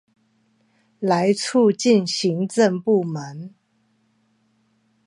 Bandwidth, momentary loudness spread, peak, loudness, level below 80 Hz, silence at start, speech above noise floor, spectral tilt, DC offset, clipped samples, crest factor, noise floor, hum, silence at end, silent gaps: 11.5 kHz; 15 LU; -4 dBFS; -20 LUFS; -74 dBFS; 1 s; 46 dB; -5 dB/octave; under 0.1%; under 0.1%; 18 dB; -65 dBFS; none; 1.6 s; none